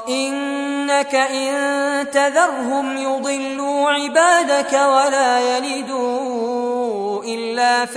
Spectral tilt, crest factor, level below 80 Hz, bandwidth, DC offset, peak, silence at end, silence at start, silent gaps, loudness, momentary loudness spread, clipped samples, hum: -1.5 dB/octave; 16 dB; -68 dBFS; 11 kHz; under 0.1%; -2 dBFS; 0 s; 0 s; none; -18 LUFS; 8 LU; under 0.1%; none